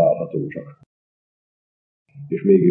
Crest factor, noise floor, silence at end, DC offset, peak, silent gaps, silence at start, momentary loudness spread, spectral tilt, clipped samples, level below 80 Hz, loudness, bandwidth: 18 dB; under -90 dBFS; 0 s; under 0.1%; -4 dBFS; 0.86-2.06 s; 0 s; 19 LU; -13.5 dB/octave; under 0.1%; -68 dBFS; -21 LUFS; 3 kHz